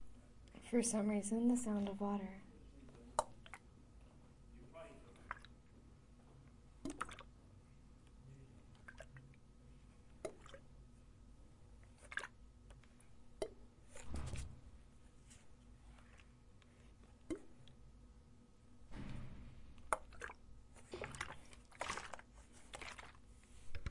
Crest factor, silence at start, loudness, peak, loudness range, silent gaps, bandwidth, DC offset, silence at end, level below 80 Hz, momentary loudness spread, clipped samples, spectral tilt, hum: 30 dB; 0 s; -45 LUFS; -18 dBFS; 16 LU; none; 11.5 kHz; under 0.1%; 0 s; -62 dBFS; 24 LU; under 0.1%; -4.5 dB/octave; none